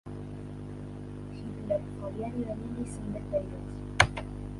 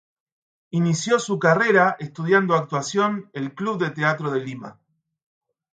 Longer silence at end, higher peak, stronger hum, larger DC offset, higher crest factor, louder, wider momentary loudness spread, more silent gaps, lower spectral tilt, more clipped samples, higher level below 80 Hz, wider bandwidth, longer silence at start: second, 0 s vs 1.05 s; about the same, -2 dBFS vs -4 dBFS; first, 50 Hz at -40 dBFS vs none; neither; first, 32 dB vs 18 dB; second, -34 LUFS vs -21 LUFS; first, 16 LU vs 12 LU; neither; about the same, -5 dB/octave vs -5.5 dB/octave; neither; first, -46 dBFS vs -70 dBFS; first, 11.5 kHz vs 9.2 kHz; second, 0.05 s vs 0.75 s